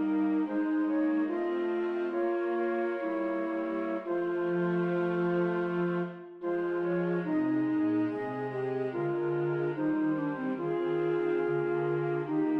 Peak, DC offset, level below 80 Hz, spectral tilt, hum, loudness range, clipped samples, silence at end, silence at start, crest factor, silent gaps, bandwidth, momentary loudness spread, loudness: -18 dBFS; under 0.1%; -74 dBFS; -9.5 dB/octave; none; 1 LU; under 0.1%; 0 s; 0 s; 12 dB; none; 4.7 kHz; 4 LU; -31 LUFS